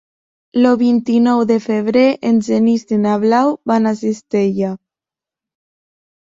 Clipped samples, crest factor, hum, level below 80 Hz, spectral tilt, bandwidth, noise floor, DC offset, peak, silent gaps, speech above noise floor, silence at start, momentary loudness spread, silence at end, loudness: under 0.1%; 14 dB; none; -60 dBFS; -7 dB/octave; 7.6 kHz; -88 dBFS; under 0.1%; -2 dBFS; none; 74 dB; 0.55 s; 7 LU; 1.45 s; -15 LUFS